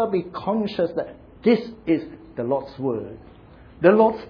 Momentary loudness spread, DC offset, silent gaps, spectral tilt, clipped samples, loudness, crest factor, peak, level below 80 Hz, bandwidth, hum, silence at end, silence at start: 14 LU; under 0.1%; none; -9 dB/octave; under 0.1%; -23 LUFS; 20 dB; -2 dBFS; -54 dBFS; 5.4 kHz; none; 0.05 s; 0 s